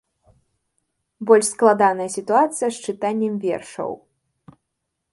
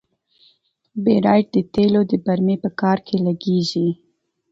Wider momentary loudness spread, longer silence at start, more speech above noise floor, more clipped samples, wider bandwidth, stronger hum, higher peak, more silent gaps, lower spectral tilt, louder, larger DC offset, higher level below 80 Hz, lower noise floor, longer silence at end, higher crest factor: first, 14 LU vs 7 LU; first, 1.2 s vs 0.95 s; first, 59 dB vs 42 dB; neither; first, 11.5 kHz vs 7.6 kHz; neither; about the same, 0 dBFS vs -2 dBFS; neither; second, -4 dB/octave vs -7.5 dB/octave; about the same, -20 LUFS vs -19 LUFS; neither; second, -68 dBFS vs -56 dBFS; first, -78 dBFS vs -60 dBFS; first, 1.15 s vs 0.6 s; about the same, 22 dB vs 18 dB